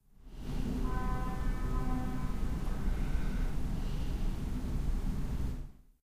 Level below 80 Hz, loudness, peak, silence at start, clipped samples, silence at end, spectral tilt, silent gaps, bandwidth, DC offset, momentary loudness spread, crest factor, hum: -34 dBFS; -38 LUFS; -20 dBFS; 0.25 s; under 0.1%; 0.3 s; -7 dB/octave; none; 15.5 kHz; under 0.1%; 4 LU; 14 dB; none